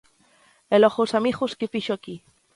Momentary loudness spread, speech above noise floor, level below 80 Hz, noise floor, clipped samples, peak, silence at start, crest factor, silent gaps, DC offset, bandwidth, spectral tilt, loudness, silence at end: 15 LU; 37 dB; -64 dBFS; -59 dBFS; under 0.1%; -4 dBFS; 0.7 s; 20 dB; none; under 0.1%; 11.5 kHz; -5.5 dB/octave; -23 LUFS; 0.4 s